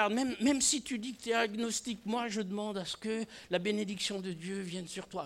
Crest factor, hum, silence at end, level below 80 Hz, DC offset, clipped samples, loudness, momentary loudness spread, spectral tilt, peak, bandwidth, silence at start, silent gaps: 20 dB; none; 0 s; -68 dBFS; under 0.1%; under 0.1%; -34 LUFS; 10 LU; -3 dB/octave; -14 dBFS; 16 kHz; 0 s; none